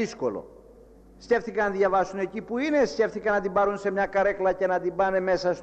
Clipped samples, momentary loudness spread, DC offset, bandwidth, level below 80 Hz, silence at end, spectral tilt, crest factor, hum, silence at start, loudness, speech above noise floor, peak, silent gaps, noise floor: under 0.1%; 6 LU; under 0.1%; 8.4 kHz; -54 dBFS; 0 s; -5.5 dB/octave; 14 dB; none; 0 s; -25 LUFS; 26 dB; -12 dBFS; none; -51 dBFS